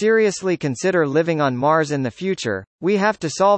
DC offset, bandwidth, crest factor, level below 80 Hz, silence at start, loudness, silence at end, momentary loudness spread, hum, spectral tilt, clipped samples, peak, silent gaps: under 0.1%; 8.8 kHz; 14 dB; -62 dBFS; 0 s; -20 LUFS; 0 s; 6 LU; none; -5.5 dB/octave; under 0.1%; -4 dBFS; 2.67-2.79 s